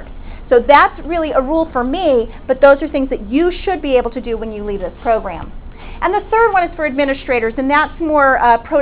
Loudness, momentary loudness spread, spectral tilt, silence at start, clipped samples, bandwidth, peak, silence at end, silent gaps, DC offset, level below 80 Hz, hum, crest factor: -15 LUFS; 12 LU; -9 dB/octave; 0 s; 0.2%; 4 kHz; 0 dBFS; 0 s; none; under 0.1%; -32 dBFS; none; 14 dB